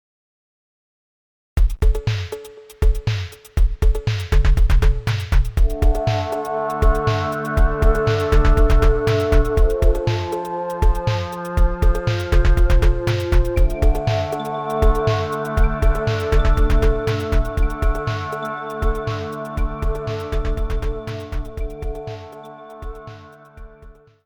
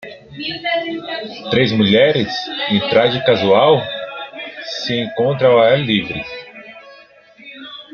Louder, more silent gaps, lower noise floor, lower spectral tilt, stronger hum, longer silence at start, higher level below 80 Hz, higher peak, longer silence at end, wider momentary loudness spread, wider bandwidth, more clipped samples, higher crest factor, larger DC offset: second, -21 LUFS vs -16 LUFS; neither; about the same, -45 dBFS vs -44 dBFS; about the same, -6.5 dB/octave vs -6 dB/octave; neither; first, 1.55 s vs 0 s; first, -18 dBFS vs -56 dBFS; about the same, -2 dBFS vs -2 dBFS; first, 0.35 s vs 0.1 s; second, 12 LU vs 20 LU; first, 17.5 kHz vs 6.8 kHz; neither; about the same, 14 dB vs 16 dB; neither